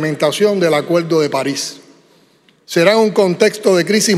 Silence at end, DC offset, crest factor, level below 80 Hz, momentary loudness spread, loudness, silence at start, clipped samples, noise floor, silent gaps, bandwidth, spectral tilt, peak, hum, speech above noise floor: 0 s; under 0.1%; 14 dB; -66 dBFS; 8 LU; -14 LUFS; 0 s; under 0.1%; -52 dBFS; none; 15.5 kHz; -4 dB/octave; 0 dBFS; none; 39 dB